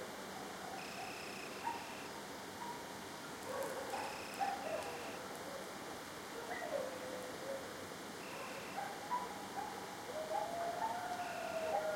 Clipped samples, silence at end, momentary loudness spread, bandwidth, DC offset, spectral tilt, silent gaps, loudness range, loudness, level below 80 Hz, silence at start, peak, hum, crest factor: under 0.1%; 0 s; 7 LU; 16.5 kHz; under 0.1%; -3 dB/octave; none; 3 LU; -44 LUFS; -76 dBFS; 0 s; -26 dBFS; none; 18 dB